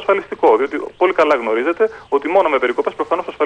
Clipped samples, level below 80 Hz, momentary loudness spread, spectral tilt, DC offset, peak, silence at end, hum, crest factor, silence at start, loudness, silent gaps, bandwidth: under 0.1%; -56 dBFS; 6 LU; -5 dB/octave; under 0.1%; -2 dBFS; 0 s; none; 14 dB; 0 s; -17 LUFS; none; 9.6 kHz